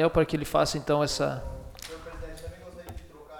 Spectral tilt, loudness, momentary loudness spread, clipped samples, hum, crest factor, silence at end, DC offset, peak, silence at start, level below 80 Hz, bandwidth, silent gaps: -5 dB/octave; -27 LUFS; 19 LU; under 0.1%; none; 20 dB; 0 s; under 0.1%; -10 dBFS; 0 s; -44 dBFS; 18.5 kHz; none